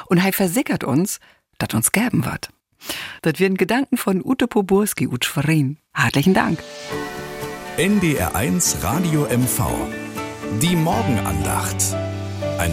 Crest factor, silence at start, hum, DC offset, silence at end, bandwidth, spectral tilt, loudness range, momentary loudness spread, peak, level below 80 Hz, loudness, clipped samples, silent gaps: 18 dB; 0 s; none; under 0.1%; 0 s; 17 kHz; -4.5 dB/octave; 2 LU; 11 LU; -2 dBFS; -44 dBFS; -20 LUFS; under 0.1%; none